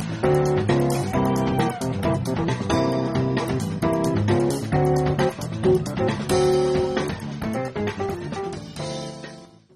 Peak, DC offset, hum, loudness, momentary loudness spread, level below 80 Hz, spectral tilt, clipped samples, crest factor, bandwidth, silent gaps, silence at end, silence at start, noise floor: -8 dBFS; under 0.1%; none; -23 LUFS; 10 LU; -44 dBFS; -6.5 dB/octave; under 0.1%; 16 dB; 14.5 kHz; none; 0.3 s; 0 s; -43 dBFS